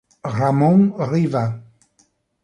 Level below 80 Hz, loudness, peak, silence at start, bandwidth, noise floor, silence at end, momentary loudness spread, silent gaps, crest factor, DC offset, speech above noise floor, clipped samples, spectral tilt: -58 dBFS; -18 LUFS; -4 dBFS; 0.25 s; 9.8 kHz; -62 dBFS; 0.8 s; 12 LU; none; 16 dB; under 0.1%; 45 dB; under 0.1%; -9 dB/octave